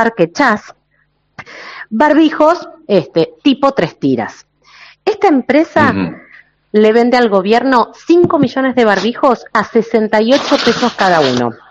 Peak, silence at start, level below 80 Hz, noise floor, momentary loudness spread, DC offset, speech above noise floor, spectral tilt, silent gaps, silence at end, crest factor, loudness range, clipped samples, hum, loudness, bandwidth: 0 dBFS; 0 s; -52 dBFS; -59 dBFS; 9 LU; under 0.1%; 47 dB; -5.5 dB/octave; none; 0.15 s; 12 dB; 3 LU; 0.3%; none; -12 LUFS; 8 kHz